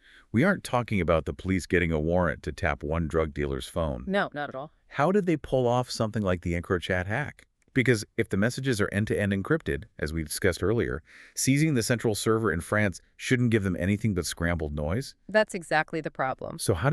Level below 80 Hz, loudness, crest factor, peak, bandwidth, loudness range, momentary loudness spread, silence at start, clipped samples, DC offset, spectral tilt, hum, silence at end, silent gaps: -44 dBFS; -27 LUFS; 18 dB; -8 dBFS; 13.5 kHz; 2 LU; 7 LU; 0.35 s; under 0.1%; under 0.1%; -5.5 dB/octave; none; 0 s; none